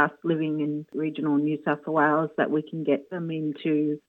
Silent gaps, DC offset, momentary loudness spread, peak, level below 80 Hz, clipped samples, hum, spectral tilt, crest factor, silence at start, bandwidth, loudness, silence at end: none; under 0.1%; 7 LU; -6 dBFS; -84 dBFS; under 0.1%; none; -9 dB/octave; 20 dB; 0 s; 4.1 kHz; -26 LUFS; 0.1 s